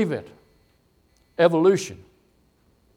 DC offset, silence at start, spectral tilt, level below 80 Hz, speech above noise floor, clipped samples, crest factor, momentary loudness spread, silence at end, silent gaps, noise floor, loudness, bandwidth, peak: under 0.1%; 0 s; -6 dB/octave; -64 dBFS; 42 dB; under 0.1%; 20 dB; 18 LU; 1 s; none; -63 dBFS; -21 LUFS; 13 kHz; -4 dBFS